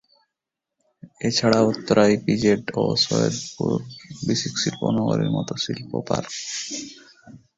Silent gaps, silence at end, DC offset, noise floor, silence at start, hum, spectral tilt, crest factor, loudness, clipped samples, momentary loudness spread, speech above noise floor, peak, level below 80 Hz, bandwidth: none; 0.2 s; under 0.1%; -85 dBFS; 1.05 s; none; -5 dB/octave; 22 dB; -22 LUFS; under 0.1%; 11 LU; 62 dB; -2 dBFS; -56 dBFS; 8 kHz